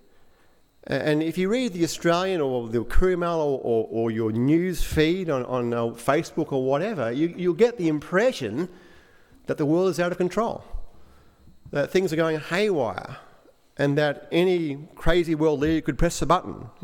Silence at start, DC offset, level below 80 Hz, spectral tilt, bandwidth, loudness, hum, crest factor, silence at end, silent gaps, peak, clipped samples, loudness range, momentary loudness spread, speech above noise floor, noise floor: 0.9 s; under 0.1%; -36 dBFS; -6 dB/octave; 16.5 kHz; -24 LUFS; none; 18 dB; 0.15 s; none; -6 dBFS; under 0.1%; 3 LU; 8 LU; 34 dB; -57 dBFS